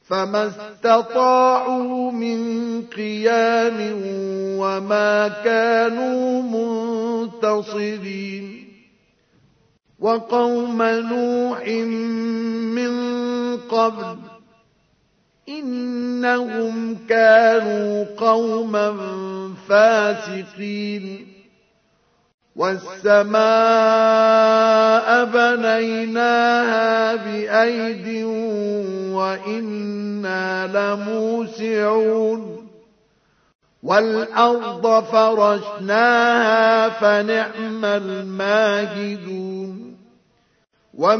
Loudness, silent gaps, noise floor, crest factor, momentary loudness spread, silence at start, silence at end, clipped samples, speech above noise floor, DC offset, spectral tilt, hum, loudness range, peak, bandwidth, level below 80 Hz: -19 LUFS; 22.34-22.38 s, 33.55-33.59 s; -63 dBFS; 18 dB; 13 LU; 0.1 s; 0 s; under 0.1%; 44 dB; under 0.1%; -5 dB/octave; none; 8 LU; -2 dBFS; 6.6 kHz; -72 dBFS